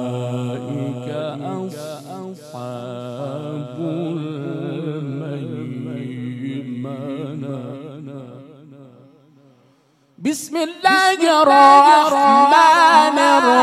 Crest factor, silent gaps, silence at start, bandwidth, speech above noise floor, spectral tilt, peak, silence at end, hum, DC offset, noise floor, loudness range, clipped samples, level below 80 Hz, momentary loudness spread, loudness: 18 dB; none; 0 s; 14.5 kHz; 45 dB; -4.5 dB/octave; 0 dBFS; 0 s; none; under 0.1%; -57 dBFS; 19 LU; under 0.1%; -72 dBFS; 21 LU; -16 LUFS